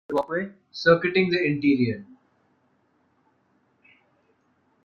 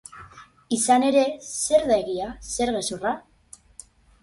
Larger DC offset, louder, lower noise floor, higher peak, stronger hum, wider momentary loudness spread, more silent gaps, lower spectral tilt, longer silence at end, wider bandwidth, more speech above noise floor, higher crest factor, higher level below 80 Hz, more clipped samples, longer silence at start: neither; about the same, -23 LUFS vs -23 LUFS; first, -67 dBFS vs -49 dBFS; about the same, -6 dBFS vs -6 dBFS; neither; second, 11 LU vs 23 LU; neither; first, -7 dB/octave vs -3 dB/octave; first, 2.8 s vs 1.05 s; second, 6.8 kHz vs 12 kHz; first, 44 dB vs 27 dB; about the same, 20 dB vs 18 dB; second, -64 dBFS vs -52 dBFS; neither; about the same, 0.1 s vs 0.15 s